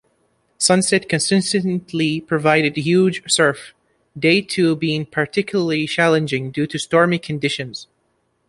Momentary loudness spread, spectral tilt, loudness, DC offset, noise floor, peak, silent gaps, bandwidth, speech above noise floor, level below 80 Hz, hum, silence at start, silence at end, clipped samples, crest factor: 7 LU; -4 dB/octave; -18 LUFS; under 0.1%; -66 dBFS; -2 dBFS; none; 11.5 kHz; 48 dB; -58 dBFS; none; 0.6 s; 0.65 s; under 0.1%; 18 dB